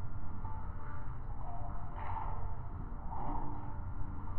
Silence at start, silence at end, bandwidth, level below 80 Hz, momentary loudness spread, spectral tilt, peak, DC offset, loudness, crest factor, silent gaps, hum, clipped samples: 0 s; 0 s; 3.1 kHz; -42 dBFS; 4 LU; -8.5 dB/octave; -24 dBFS; under 0.1%; -44 LUFS; 12 dB; none; none; under 0.1%